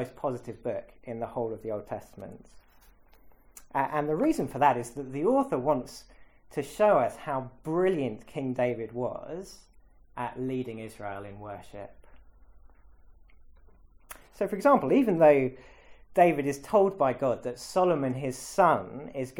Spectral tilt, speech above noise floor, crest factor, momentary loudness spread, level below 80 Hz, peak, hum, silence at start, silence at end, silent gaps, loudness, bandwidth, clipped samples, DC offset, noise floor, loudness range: -6.5 dB/octave; 30 dB; 20 dB; 19 LU; -58 dBFS; -8 dBFS; none; 0 s; 0 s; none; -28 LUFS; 17.5 kHz; under 0.1%; under 0.1%; -57 dBFS; 14 LU